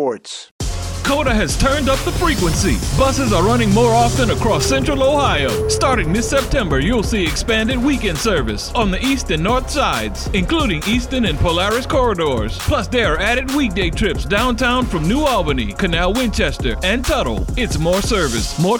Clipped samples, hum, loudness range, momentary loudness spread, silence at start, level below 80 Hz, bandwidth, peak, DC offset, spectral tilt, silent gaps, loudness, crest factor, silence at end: under 0.1%; none; 3 LU; 5 LU; 0 s; -24 dBFS; 19.5 kHz; -2 dBFS; 0.2%; -4.5 dB/octave; 0.51-0.59 s; -17 LUFS; 14 dB; 0 s